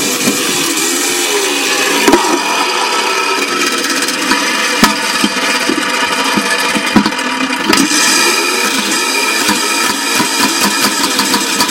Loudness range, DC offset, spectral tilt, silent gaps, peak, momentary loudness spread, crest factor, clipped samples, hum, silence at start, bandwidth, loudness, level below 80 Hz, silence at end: 1 LU; under 0.1%; -1.5 dB/octave; none; 0 dBFS; 3 LU; 12 dB; 0.1%; none; 0 s; over 20 kHz; -11 LUFS; -48 dBFS; 0 s